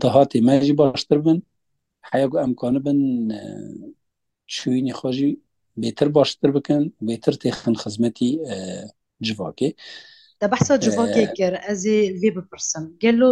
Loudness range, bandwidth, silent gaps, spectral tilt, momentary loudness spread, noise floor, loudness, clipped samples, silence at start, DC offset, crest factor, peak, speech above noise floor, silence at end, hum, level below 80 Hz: 5 LU; 10.5 kHz; none; -5.5 dB/octave; 15 LU; -76 dBFS; -21 LUFS; under 0.1%; 0 s; under 0.1%; 20 dB; -2 dBFS; 56 dB; 0 s; none; -58 dBFS